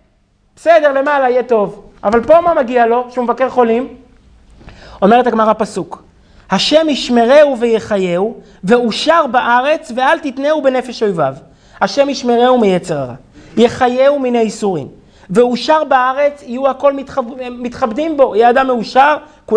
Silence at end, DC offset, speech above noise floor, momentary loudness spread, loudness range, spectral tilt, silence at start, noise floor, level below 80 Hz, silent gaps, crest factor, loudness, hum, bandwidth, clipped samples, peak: 0 s; under 0.1%; 43 dB; 11 LU; 3 LU; -5 dB/octave; 0.65 s; -55 dBFS; -46 dBFS; none; 12 dB; -13 LUFS; none; 10.5 kHz; 0.2%; 0 dBFS